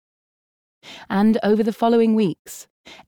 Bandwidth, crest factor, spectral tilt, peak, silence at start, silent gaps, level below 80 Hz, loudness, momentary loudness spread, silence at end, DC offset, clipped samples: 17.5 kHz; 14 dB; -6.5 dB/octave; -6 dBFS; 0.85 s; 2.39-2.45 s, 2.70-2.84 s; -62 dBFS; -19 LUFS; 21 LU; 0.15 s; under 0.1%; under 0.1%